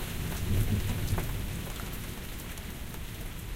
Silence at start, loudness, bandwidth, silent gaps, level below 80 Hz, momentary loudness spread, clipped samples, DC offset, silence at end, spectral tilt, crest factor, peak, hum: 0 s; -35 LUFS; 17 kHz; none; -38 dBFS; 10 LU; under 0.1%; under 0.1%; 0 s; -5 dB/octave; 16 dB; -16 dBFS; none